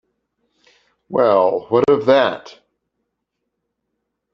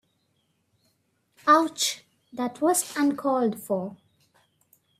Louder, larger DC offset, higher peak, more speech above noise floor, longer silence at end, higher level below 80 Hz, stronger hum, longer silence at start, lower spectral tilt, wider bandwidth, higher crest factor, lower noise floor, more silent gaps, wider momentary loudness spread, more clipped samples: first, -16 LUFS vs -25 LUFS; neither; first, -2 dBFS vs -6 dBFS; first, 61 dB vs 47 dB; first, 1.85 s vs 1.05 s; first, -60 dBFS vs -76 dBFS; neither; second, 1.1 s vs 1.45 s; first, -6.5 dB/octave vs -3 dB/octave; second, 7 kHz vs 16 kHz; about the same, 18 dB vs 22 dB; first, -76 dBFS vs -72 dBFS; neither; second, 9 LU vs 14 LU; neither